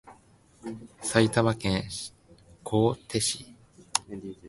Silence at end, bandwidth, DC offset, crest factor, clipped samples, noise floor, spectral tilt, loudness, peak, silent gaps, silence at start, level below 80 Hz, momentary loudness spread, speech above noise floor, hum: 0 s; 12 kHz; under 0.1%; 26 dB; under 0.1%; -59 dBFS; -4.5 dB/octave; -27 LUFS; -4 dBFS; none; 0.05 s; -54 dBFS; 18 LU; 32 dB; none